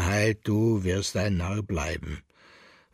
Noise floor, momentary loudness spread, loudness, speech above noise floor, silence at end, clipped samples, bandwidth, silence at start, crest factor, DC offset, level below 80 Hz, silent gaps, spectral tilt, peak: -55 dBFS; 11 LU; -27 LUFS; 28 dB; 0.75 s; under 0.1%; 14.5 kHz; 0 s; 18 dB; under 0.1%; -42 dBFS; none; -5.5 dB/octave; -10 dBFS